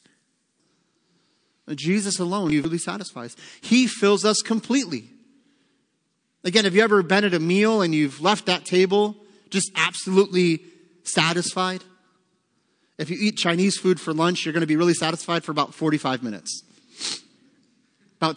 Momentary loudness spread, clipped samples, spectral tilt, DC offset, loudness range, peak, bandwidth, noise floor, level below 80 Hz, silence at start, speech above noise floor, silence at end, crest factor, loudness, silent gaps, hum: 13 LU; under 0.1%; -4 dB/octave; under 0.1%; 5 LU; -2 dBFS; 10.5 kHz; -72 dBFS; -68 dBFS; 1.65 s; 51 dB; 0 s; 20 dB; -22 LUFS; none; none